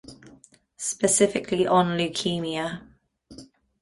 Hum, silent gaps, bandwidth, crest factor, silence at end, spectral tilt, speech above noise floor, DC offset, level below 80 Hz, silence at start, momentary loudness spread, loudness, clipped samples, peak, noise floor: none; none; 11.5 kHz; 20 dB; 0.35 s; -3.5 dB/octave; 31 dB; under 0.1%; -60 dBFS; 0.1 s; 11 LU; -24 LUFS; under 0.1%; -6 dBFS; -55 dBFS